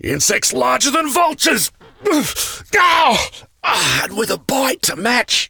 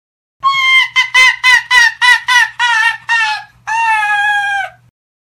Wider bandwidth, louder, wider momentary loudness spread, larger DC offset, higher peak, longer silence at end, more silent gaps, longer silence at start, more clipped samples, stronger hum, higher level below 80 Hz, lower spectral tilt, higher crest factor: about the same, over 20 kHz vs over 20 kHz; second, -15 LUFS vs -9 LUFS; second, 7 LU vs 10 LU; neither; about the same, -2 dBFS vs 0 dBFS; second, 0.05 s vs 0.55 s; neither; second, 0.05 s vs 0.45 s; second, under 0.1% vs 0.6%; neither; first, -46 dBFS vs -54 dBFS; first, -1.5 dB/octave vs 3 dB/octave; about the same, 14 dB vs 12 dB